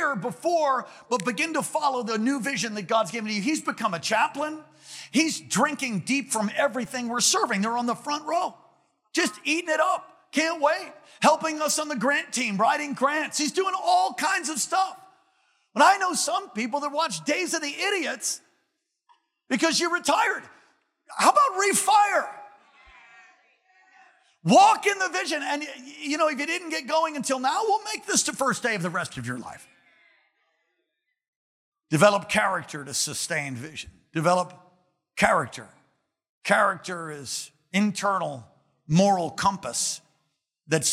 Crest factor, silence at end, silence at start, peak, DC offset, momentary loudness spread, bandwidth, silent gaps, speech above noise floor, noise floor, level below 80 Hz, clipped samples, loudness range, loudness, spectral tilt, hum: 22 dB; 0 s; 0 s; -4 dBFS; under 0.1%; 13 LU; 16.5 kHz; 31.28-31.72 s, 36.29-36.41 s; 54 dB; -78 dBFS; -68 dBFS; under 0.1%; 4 LU; -24 LUFS; -3 dB/octave; none